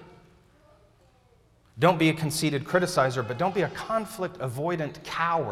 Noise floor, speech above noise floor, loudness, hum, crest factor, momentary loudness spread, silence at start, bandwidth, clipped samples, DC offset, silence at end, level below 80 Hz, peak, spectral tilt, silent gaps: -61 dBFS; 35 dB; -26 LUFS; none; 20 dB; 9 LU; 0 s; 16 kHz; under 0.1%; under 0.1%; 0 s; -60 dBFS; -6 dBFS; -5 dB/octave; none